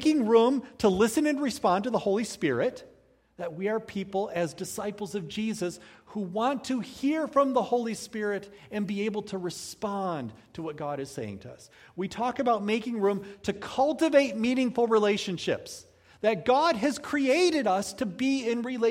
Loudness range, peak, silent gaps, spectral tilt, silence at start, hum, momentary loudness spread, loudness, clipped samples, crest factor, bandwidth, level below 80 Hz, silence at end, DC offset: 7 LU; -8 dBFS; none; -5 dB/octave; 0 s; none; 13 LU; -28 LUFS; under 0.1%; 20 dB; 16 kHz; -64 dBFS; 0 s; under 0.1%